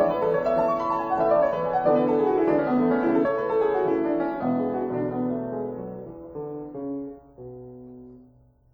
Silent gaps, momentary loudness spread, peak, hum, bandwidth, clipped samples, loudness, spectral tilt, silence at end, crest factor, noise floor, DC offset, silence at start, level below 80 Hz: none; 19 LU; -10 dBFS; none; over 20 kHz; under 0.1%; -24 LUFS; -9 dB/octave; 0.5 s; 16 dB; -56 dBFS; under 0.1%; 0 s; -56 dBFS